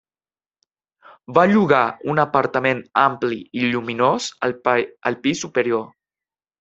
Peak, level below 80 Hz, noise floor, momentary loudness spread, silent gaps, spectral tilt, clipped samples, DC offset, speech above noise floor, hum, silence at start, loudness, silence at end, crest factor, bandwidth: -2 dBFS; -62 dBFS; under -90 dBFS; 9 LU; none; -5 dB/octave; under 0.1%; under 0.1%; over 71 dB; none; 1.3 s; -19 LUFS; 0.75 s; 20 dB; 8.2 kHz